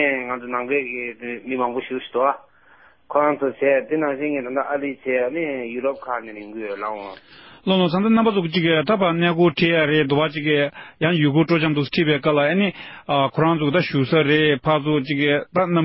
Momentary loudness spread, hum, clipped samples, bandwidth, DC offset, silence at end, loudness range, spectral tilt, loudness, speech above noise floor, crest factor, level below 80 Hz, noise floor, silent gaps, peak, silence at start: 11 LU; none; under 0.1%; 5.8 kHz; under 0.1%; 0 s; 6 LU; -11 dB/octave; -20 LUFS; 33 dB; 16 dB; -58 dBFS; -53 dBFS; none; -4 dBFS; 0 s